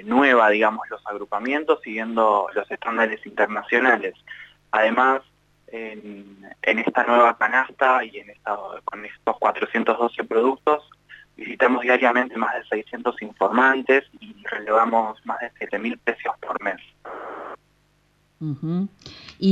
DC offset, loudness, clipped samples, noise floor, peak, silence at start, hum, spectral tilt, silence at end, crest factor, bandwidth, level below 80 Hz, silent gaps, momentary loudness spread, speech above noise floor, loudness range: under 0.1%; -21 LUFS; under 0.1%; -63 dBFS; -4 dBFS; 0 s; 50 Hz at -65 dBFS; -6.5 dB/octave; 0 s; 18 dB; 9 kHz; -66 dBFS; none; 18 LU; 41 dB; 6 LU